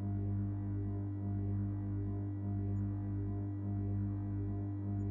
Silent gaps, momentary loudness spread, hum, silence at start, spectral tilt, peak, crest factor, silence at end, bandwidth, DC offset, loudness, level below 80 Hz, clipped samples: none; 2 LU; 50 Hz at -40 dBFS; 0 s; -13 dB/octave; -28 dBFS; 8 dB; 0 s; 2.4 kHz; under 0.1%; -39 LUFS; -52 dBFS; under 0.1%